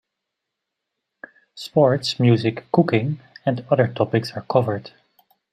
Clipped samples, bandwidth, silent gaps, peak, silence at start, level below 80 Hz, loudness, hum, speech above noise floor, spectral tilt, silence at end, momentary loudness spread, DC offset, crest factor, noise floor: under 0.1%; 11.5 kHz; none; -2 dBFS; 1.55 s; -64 dBFS; -21 LUFS; none; 62 dB; -7 dB/octave; 0.65 s; 9 LU; under 0.1%; 20 dB; -82 dBFS